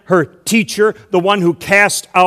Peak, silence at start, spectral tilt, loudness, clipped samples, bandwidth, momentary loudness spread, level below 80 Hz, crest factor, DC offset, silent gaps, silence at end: 0 dBFS; 0.1 s; -4 dB/octave; -13 LUFS; 0.3%; 15 kHz; 5 LU; -54 dBFS; 14 dB; under 0.1%; none; 0 s